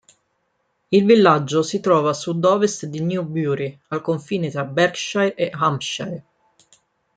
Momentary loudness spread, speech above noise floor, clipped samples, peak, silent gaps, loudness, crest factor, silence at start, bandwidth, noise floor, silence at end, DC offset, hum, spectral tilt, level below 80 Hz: 12 LU; 50 dB; under 0.1%; -2 dBFS; none; -20 LUFS; 18 dB; 0.9 s; 9.4 kHz; -70 dBFS; 0.95 s; under 0.1%; none; -5.5 dB/octave; -66 dBFS